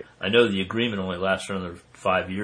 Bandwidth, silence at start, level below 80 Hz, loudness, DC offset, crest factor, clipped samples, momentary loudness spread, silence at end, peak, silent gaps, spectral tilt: 10.5 kHz; 0 s; -58 dBFS; -24 LUFS; under 0.1%; 20 dB; under 0.1%; 11 LU; 0 s; -6 dBFS; none; -5 dB/octave